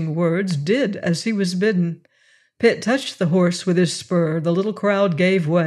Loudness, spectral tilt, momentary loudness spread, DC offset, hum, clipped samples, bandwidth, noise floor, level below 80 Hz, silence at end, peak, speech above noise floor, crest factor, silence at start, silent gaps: -20 LUFS; -6 dB/octave; 4 LU; under 0.1%; none; under 0.1%; 12 kHz; -58 dBFS; -68 dBFS; 0 s; -4 dBFS; 39 dB; 14 dB; 0 s; none